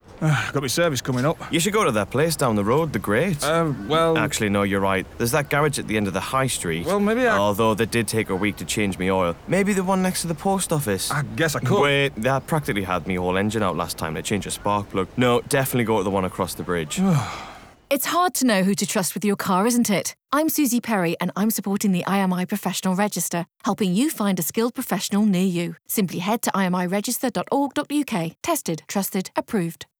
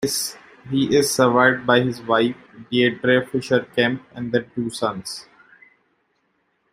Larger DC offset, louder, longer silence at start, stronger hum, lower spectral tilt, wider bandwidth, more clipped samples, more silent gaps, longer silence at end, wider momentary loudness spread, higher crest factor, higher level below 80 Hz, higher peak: neither; about the same, -22 LUFS vs -20 LUFS; about the same, 0.1 s vs 0 s; neither; about the same, -4.5 dB/octave vs -4 dB/octave; first, over 20 kHz vs 16 kHz; neither; neither; second, 0.15 s vs 1.5 s; second, 6 LU vs 13 LU; second, 12 dB vs 20 dB; first, -50 dBFS vs -60 dBFS; second, -10 dBFS vs -2 dBFS